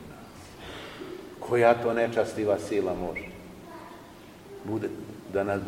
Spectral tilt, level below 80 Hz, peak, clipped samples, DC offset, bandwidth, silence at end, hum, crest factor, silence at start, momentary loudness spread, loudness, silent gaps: -6 dB/octave; -56 dBFS; -8 dBFS; under 0.1%; under 0.1%; 16.5 kHz; 0 s; none; 22 dB; 0 s; 23 LU; -27 LUFS; none